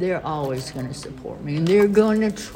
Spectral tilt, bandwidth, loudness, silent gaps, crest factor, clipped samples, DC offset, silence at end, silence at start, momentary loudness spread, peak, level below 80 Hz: -6.5 dB/octave; 16.5 kHz; -21 LUFS; none; 18 dB; under 0.1%; under 0.1%; 0 s; 0 s; 16 LU; -4 dBFS; -48 dBFS